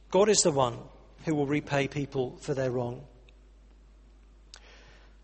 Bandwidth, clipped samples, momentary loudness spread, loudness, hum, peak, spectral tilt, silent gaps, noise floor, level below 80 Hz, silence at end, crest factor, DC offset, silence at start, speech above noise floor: 8.4 kHz; under 0.1%; 15 LU; -28 LUFS; none; -8 dBFS; -4 dB/octave; none; -55 dBFS; -54 dBFS; 2.2 s; 22 dB; under 0.1%; 0.1 s; 27 dB